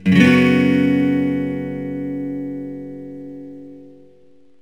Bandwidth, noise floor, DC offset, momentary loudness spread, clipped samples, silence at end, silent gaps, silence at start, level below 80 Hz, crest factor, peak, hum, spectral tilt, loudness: 19.5 kHz; -53 dBFS; 0.3%; 22 LU; under 0.1%; 0.7 s; none; 0 s; -62 dBFS; 18 dB; 0 dBFS; none; -7 dB/octave; -17 LUFS